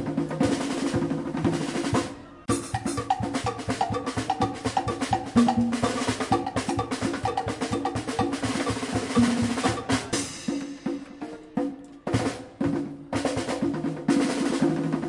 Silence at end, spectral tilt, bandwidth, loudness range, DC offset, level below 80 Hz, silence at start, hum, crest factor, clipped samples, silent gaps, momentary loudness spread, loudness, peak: 0 s; -5 dB/octave; 11.5 kHz; 4 LU; under 0.1%; -50 dBFS; 0 s; none; 20 dB; under 0.1%; none; 8 LU; -27 LUFS; -6 dBFS